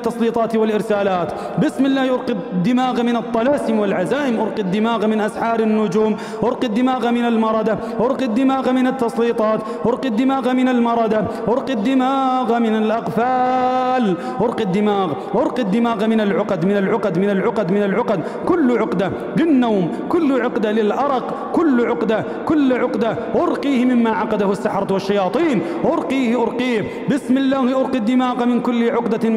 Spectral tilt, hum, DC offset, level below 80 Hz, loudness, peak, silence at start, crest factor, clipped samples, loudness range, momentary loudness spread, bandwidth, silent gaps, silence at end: -7 dB/octave; none; under 0.1%; -54 dBFS; -18 LUFS; -6 dBFS; 0 s; 12 dB; under 0.1%; 1 LU; 4 LU; 12 kHz; none; 0 s